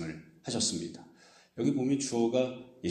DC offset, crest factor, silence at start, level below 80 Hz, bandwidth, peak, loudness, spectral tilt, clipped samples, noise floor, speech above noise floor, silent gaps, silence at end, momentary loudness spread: under 0.1%; 16 dB; 0 s; -68 dBFS; 11 kHz; -16 dBFS; -31 LUFS; -4.5 dB/octave; under 0.1%; -59 dBFS; 28 dB; none; 0 s; 15 LU